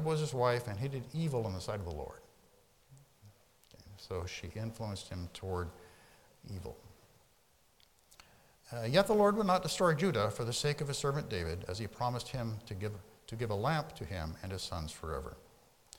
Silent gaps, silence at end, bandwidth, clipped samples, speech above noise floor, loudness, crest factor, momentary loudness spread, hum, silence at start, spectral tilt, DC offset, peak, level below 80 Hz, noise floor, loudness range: none; 0.55 s; 18 kHz; under 0.1%; 34 dB; -36 LUFS; 22 dB; 17 LU; none; 0 s; -5.5 dB/octave; under 0.1%; -16 dBFS; -58 dBFS; -69 dBFS; 14 LU